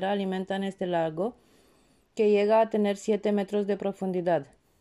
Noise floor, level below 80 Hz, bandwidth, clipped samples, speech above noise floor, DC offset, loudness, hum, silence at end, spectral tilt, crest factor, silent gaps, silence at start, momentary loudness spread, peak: -64 dBFS; -70 dBFS; 11.5 kHz; under 0.1%; 37 dB; under 0.1%; -27 LUFS; none; 0.35 s; -6.5 dB/octave; 14 dB; none; 0 s; 8 LU; -14 dBFS